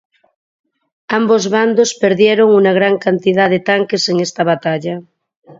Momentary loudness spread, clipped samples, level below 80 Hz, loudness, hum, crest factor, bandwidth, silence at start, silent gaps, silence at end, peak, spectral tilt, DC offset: 9 LU; under 0.1%; -62 dBFS; -13 LUFS; none; 14 dB; 7.8 kHz; 1.1 s; 5.37-5.42 s; 0.05 s; 0 dBFS; -4.5 dB/octave; under 0.1%